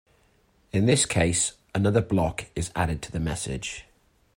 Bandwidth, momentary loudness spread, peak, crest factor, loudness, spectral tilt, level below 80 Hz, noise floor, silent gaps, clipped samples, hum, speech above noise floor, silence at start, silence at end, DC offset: 16.5 kHz; 11 LU; -8 dBFS; 20 dB; -26 LUFS; -4.5 dB/octave; -44 dBFS; -63 dBFS; none; under 0.1%; none; 38 dB; 0.75 s; 0.55 s; under 0.1%